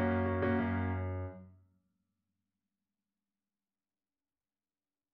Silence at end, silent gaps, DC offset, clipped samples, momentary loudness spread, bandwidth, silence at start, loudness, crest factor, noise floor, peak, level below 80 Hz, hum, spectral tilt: 3.65 s; none; under 0.1%; under 0.1%; 13 LU; 4.5 kHz; 0 s; -35 LUFS; 18 dB; under -90 dBFS; -20 dBFS; -62 dBFS; none; -7.5 dB/octave